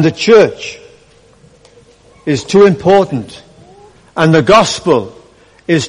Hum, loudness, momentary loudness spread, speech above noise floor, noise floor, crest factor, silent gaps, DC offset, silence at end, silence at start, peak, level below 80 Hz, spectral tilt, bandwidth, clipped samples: none; -10 LUFS; 18 LU; 35 dB; -45 dBFS; 12 dB; none; under 0.1%; 0 s; 0 s; 0 dBFS; -46 dBFS; -5.5 dB/octave; 11 kHz; under 0.1%